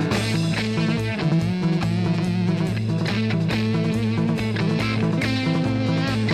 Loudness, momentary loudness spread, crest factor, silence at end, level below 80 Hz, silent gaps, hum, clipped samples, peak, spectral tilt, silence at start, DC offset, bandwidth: -22 LUFS; 1 LU; 12 dB; 0 s; -46 dBFS; none; none; under 0.1%; -8 dBFS; -6.5 dB/octave; 0 s; 0.1%; 13 kHz